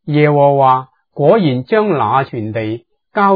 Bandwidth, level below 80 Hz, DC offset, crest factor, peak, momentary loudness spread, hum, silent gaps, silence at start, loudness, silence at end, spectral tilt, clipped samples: 5 kHz; -60 dBFS; under 0.1%; 14 dB; 0 dBFS; 13 LU; none; none; 0.05 s; -14 LUFS; 0 s; -11 dB/octave; under 0.1%